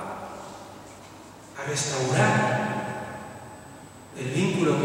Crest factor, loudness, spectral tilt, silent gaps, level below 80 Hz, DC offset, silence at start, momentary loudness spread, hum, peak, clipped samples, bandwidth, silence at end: 20 dB; -26 LUFS; -5 dB/octave; none; -62 dBFS; under 0.1%; 0 s; 23 LU; none; -8 dBFS; under 0.1%; 16.5 kHz; 0 s